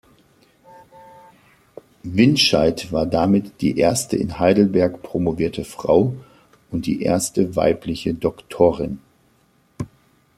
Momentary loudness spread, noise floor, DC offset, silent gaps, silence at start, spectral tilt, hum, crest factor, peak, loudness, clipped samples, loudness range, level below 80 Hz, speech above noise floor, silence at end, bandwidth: 14 LU; -59 dBFS; under 0.1%; none; 2.05 s; -5 dB/octave; none; 18 dB; -2 dBFS; -19 LUFS; under 0.1%; 4 LU; -48 dBFS; 41 dB; 0.5 s; 15 kHz